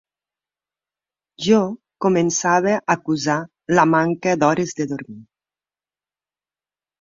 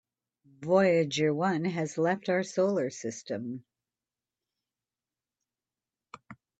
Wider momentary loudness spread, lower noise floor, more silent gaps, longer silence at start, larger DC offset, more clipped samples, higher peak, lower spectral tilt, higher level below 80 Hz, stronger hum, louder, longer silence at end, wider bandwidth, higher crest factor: second, 10 LU vs 13 LU; about the same, under -90 dBFS vs under -90 dBFS; neither; first, 1.4 s vs 0.6 s; neither; neither; first, -2 dBFS vs -12 dBFS; about the same, -5 dB/octave vs -5.5 dB/octave; first, -62 dBFS vs -76 dBFS; first, 50 Hz at -50 dBFS vs none; first, -19 LUFS vs -29 LUFS; first, 1.8 s vs 0.25 s; second, 7.6 kHz vs 8.6 kHz; about the same, 20 dB vs 20 dB